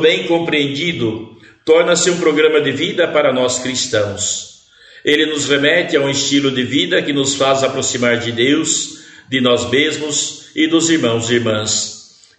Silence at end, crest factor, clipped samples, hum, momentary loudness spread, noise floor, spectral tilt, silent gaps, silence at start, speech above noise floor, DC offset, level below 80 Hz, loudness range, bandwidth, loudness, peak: 0.35 s; 16 dB; under 0.1%; none; 7 LU; -44 dBFS; -3 dB/octave; none; 0 s; 29 dB; under 0.1%; -56 dBFS; 1 LU; 9.4 kHz; -15 LUFS; 0 dBFS